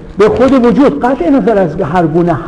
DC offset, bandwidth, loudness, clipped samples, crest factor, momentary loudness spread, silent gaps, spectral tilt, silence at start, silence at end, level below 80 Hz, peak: under 0.1%; 10 kHz; -9 LUFS; under 0.1%; 10 dB; 5 LU; none; -8 dB/octave; 0 s; 0 s; -32 dBFS; 0 dBFS